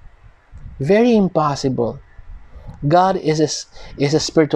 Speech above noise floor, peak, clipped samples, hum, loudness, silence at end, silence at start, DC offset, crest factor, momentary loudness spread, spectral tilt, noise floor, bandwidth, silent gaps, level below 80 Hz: 27 dB; -2 dBFS; under 0.1%; none; -17 LUFS; 0 s; 0.05 s; under 0.1%; 16 dB; 12 LU; -5.5 dB/octave; -44 dBFS; 10.5 kHz; none; -42 dBFS